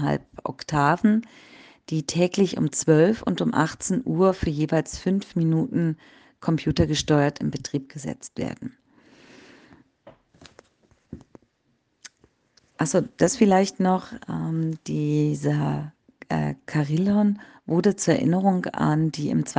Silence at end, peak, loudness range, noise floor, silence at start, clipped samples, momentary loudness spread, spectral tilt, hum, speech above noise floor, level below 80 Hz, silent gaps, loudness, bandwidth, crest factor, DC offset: 0 s; -4 dBFS; 10 LU; -70 dBFS; 0 s; under 0.1%; 12 LU; -6 dB/octave; none; 47 dB; -50 dBFS; none; -24 LUFS; 9.8 kHz; 20 dB; under 0.1%